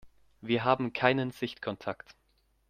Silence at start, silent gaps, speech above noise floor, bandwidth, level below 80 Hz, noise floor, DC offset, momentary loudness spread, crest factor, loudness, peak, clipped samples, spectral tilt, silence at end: 0.05 s; none; 41 dB; 15 kHz; -66 dBFS; -71 dBFS; under 0.1%; 13 LU; 26 dB; -30 LUFS; -6 dBFS; under 0.1%; -7 dB/octave; 0.75 s